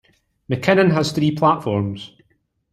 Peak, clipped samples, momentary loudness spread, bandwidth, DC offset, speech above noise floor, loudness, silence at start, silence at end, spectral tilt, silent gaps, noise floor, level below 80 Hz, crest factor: -2 dBFS; under 0.1%; 14 LU; 14 kHz; under 0.1%; 48 dB; -18 LUFS; 0.5 s; 0.65 s; -6.5 dB/octave; none; -65 dBFS; -54 dBFS; 18 dB